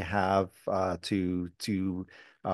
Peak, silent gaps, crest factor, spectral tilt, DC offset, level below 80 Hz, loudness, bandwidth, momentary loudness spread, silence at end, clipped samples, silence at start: -12 dBFS; none; 20 dB; -6 dB/octave; under 0.1%; -60 dBFS; -31 LUFS; 12.5 kHz; 12 LU; 0 s; under 0.1%; 0 s